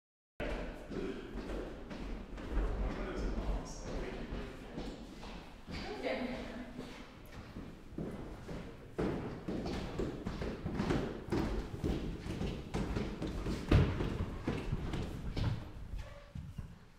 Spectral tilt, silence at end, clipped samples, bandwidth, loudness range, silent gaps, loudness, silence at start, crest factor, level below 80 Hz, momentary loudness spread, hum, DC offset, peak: -7 dB/octave; 0 s; under 0.1%; 14 kHz; 7 LU; none; -41 LUFS; 0.4 s; 26 dB; -44 dBFS; 12 LU; none; under 0.1%; -14 dBFS